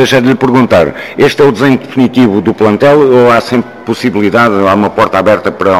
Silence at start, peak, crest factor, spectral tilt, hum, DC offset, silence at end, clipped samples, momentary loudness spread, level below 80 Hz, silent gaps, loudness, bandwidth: 0 s; 0 dBFS; 8 dB; -6.5 dB/octave; none; 0.7%; 0 s; 0.2%; 6 LU; -42 dBFS; none; -8 LUFS; 15 kHz